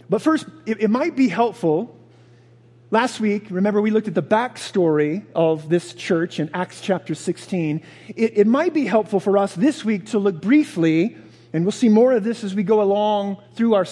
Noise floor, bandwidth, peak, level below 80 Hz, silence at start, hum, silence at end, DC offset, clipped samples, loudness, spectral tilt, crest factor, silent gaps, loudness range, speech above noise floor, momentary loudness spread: -50 dBFS; 12 kHz; -2 dBFS; -72 dBFS; 0.1 s; none; 0 s; under 0.1%; under 0.1%; -20 LUFS; -6.5 dB/octave; 18 dB; none; 3 LU; 31 dB; 8 LU